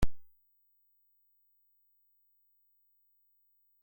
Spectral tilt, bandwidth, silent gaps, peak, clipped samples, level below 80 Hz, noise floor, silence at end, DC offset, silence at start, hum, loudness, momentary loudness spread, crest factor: -6 dB/octave; 16.5 kHz; none; -16 dBFS; under 0.1%; -48 dBFS; -72 dBFS; 0 s; under 0.1%; 0 s; 50 Hz at -115 dBFS; -42 LUFS; 0 LU; 22 dB